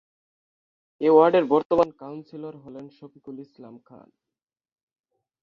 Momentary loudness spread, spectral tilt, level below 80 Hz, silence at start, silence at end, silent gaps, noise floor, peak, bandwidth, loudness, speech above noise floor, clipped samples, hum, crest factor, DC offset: 25 LU; -8 dB/octave; -66 dBFS; 1 s; 2 s; 1.65-1.70 s; -89 dBFS; -4 dBFS; 6.2 kHz; -20 LUFS; 66 dB; under 0.1%; none; 22 dB; under 0.1%